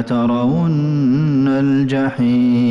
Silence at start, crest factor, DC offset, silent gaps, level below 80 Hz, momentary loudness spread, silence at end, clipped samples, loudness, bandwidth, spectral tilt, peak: 0 s; 6 dB; under 0.1%; none; -48 dBFS; 2 LU; 0 s; under 0.1%; -15 LUFS; 7.4 kHz; -9 dB/octave; -8 dBFS